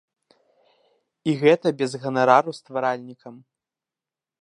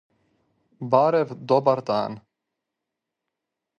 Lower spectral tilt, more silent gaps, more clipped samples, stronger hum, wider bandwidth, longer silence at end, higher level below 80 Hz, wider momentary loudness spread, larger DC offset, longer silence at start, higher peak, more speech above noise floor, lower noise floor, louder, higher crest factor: second, -6 dB/octave vs -7.5 dB/octave; neither; neither; neither; first, 11 kHz vs 7 kHz; second, 1.05 s vs 1.6 s; about the same, -74 dBFS vs -72 dBFS; about the same, 15 LU vs 16 LU; neither; first, 1.25 s vs 0.8 s; about the same, -2 dBFS vs -4 dBFS; first, over 69 dB vs 63 dB; first, under -90 dBFS vs -84 dBFS; about the same, -21 LUFS vs -22 LUFS; about the same, 22 dB vs 22 dB